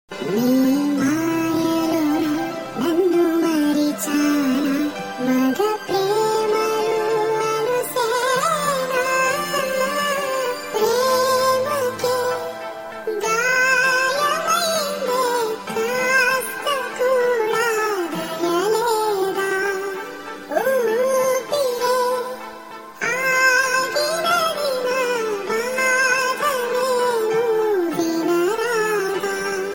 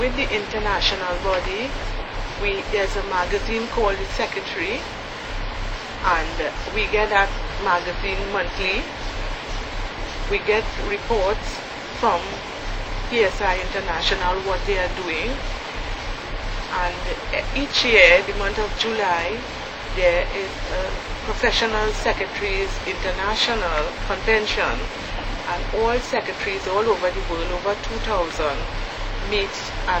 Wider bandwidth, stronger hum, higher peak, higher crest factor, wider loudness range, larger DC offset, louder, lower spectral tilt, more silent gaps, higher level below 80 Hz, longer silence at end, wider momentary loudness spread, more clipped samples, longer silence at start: first, 17 kHz vs 8.6 kHz; neither; second, -6 dBFS vs 0 dBFS; second, 14 dB vs 22 dB; second, 2 LU vs 6 LU; neither; first, -20 LUFS vs -23 LUFS; about the same, -3 dB/octave vs -3.5 dB/octave; neither; second, -60 dBFS vs -30 dBFS; about the same, 0 s vs 0 s; second, 7 LU vs 10 LU; neither; about the same, 0.1 s vs 0 s